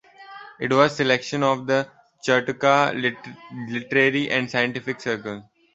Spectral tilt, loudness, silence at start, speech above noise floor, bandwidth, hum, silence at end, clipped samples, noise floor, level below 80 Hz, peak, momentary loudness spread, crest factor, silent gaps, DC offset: -5 dB/octave; -22 LUFS; 0.2 s; 21 dB; 8 kHz; none; 0.3 s; under 0.1%; -43 dBFS; -64 dBFS; -2 dBFS; 17 LU; 20 dB; none; under 0.1%